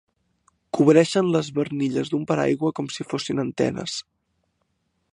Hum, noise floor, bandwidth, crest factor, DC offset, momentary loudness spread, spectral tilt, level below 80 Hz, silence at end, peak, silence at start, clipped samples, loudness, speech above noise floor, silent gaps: none; -72 dBFS; 11 kHz; 20 dB; under 0.1%; 13 LU; -6 dB/octave; -62 dBFS; 1.1 s; -2 dBFS; 0.75 s; under 0.1%; -23 LUFS; 50 dB; none